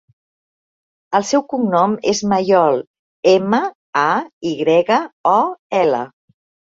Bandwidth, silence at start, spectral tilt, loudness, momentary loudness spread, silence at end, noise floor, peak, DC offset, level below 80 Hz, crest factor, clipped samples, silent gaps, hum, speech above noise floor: 7.8 kHz; 1.1 s; -5 dB/octave; -17 LUFS; 7 LU; 0.6 s; under -90 dBFS; -2 dBFS; under 0.1%; -62 dBFS; 16 dB; under 0.1%; 2.87-3.23 s, 3.75-3.93 s, 4.33-4.41 s, 5.13-5.24 s, 5.59-5.70 s; none; over 74 dB